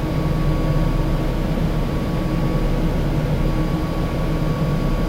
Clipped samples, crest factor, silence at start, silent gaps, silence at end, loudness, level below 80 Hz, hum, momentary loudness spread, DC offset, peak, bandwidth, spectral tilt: under 0.1%; 12 dB; 0 s; none; 0 s; -22 LUFS; -24 dBFS; none; 2 LU; 0.2%; -8 dBFS; 16 kHz; -7.5 dB/octave